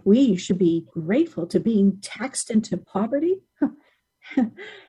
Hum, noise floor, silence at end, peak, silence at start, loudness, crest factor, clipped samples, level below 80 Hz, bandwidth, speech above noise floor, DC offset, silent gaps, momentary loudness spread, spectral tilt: none; -59 dBFS; 0.1 s; -6 dBFS; 0.05 s; -23 LUFS; 16 dB; under 0.1%; -62 dBFS; 11.5 kHz; 37 dB; under 0.1%; none; 9 LU; -6 dB/octave